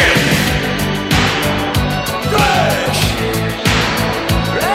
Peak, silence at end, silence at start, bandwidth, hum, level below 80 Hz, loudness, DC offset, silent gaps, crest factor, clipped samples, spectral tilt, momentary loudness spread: 0 dBFS; 0 s; 0 s; 16.5 kHz; none; -28 dBFS; -14 LUFS; under 0.1%; none; 14 dB; under 0.1%; -4 dB/octave; 5 LU